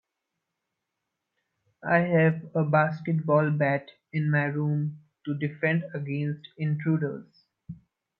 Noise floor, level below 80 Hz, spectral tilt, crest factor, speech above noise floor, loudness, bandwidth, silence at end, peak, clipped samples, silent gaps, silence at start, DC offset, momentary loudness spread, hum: -84 dBFS; -70 dBFS; -11 dB/octave; 18 dB; 58 dB; -27 LUFS; 5.4 kHz; 0.45 s; -10 dBFS; under 0.1%; none; 1.85 s; under 0.1%; 16 LU; none